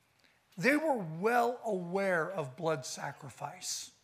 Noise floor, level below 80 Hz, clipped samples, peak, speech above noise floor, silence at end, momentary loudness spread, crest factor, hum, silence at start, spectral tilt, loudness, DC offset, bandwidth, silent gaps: -69 dBFS; -84 dBFS; under 0.1%; -12 dBFS; 36 dB; 0.15 s; 13 LU; 22 dB; none; 0.55 s; -4 dB/octave; -33 LUFS; under 0.1%; 15.5 kHz; none